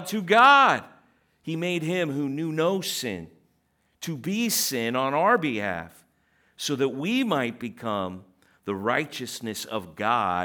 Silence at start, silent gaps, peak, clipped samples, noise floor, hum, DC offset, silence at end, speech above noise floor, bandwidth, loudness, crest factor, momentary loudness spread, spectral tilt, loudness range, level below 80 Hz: 0 s; none; -6 dBFS; under 0.1%; -69 dBFS; none; under 0.1%; 0 s; 45 dB; over 20 kHz; -24 LUFS; 20 dB; 15 LU; -4 dB/octave; 6 LU; -72 dBFS